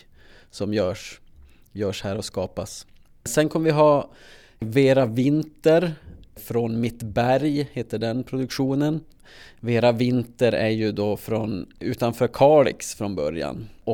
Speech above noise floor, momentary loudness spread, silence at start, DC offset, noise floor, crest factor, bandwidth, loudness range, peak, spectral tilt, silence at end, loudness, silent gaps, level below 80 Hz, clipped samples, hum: 28 dB; 15 LU; 0.55 s; under 0.1%; -50 dBFS; 20 dB; 18.5 kHz; 4 LU; -4 dBFS; -6 dB/octave; 0 s; -23 LUFS; none; -52 dBFS; under 0.1%; none